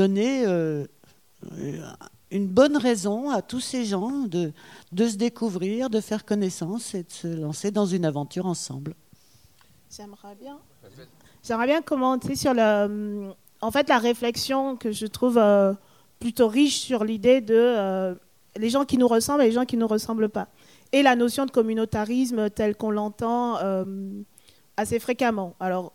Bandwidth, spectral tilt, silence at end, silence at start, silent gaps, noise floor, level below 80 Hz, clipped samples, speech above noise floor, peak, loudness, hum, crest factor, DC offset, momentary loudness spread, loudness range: 16.5 kHz; -5 dB/octave; 0.05 s; 0 s; none; -58 dBFS; -60 dBFS; under 0.1%; 35 dB; -4 dBFS; -24 LUFS; none; 20 dB; under 0.1%; 16 LU; 8 LU